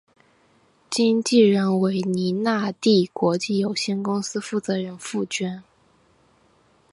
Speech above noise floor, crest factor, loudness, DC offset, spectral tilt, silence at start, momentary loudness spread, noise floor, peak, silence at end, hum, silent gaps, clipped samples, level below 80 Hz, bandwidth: 39 dB; 18 dB; -22 LUFS; under 0.1%; -5 dB/octave; 0.9 s; 10 LU; -60 dBFS; -4 dBFS; 1.3 s; none; none; under 0.1%; -68 dBFS; 11.5 kHz